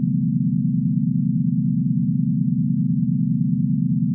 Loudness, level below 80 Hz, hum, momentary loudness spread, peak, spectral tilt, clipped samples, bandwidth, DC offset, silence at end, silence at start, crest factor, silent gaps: -21 LUFS; -58 dBFS; none; 0 LU; -10 dBFS; -17 dB/octave; under 0.1%; 0.4 kHz; under 0.1%; 0 s; 0 s; 10 dB; none